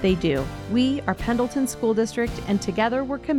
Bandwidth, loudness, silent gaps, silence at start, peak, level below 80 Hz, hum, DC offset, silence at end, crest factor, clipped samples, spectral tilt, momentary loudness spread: 17 kHz; -24 LUFS; none; 0 s; -8 dBFS; -40 dBFS; none; under 0.1%; 0 s; 16 dB; under 0.1%; -5.5 dB/octave; 4 LU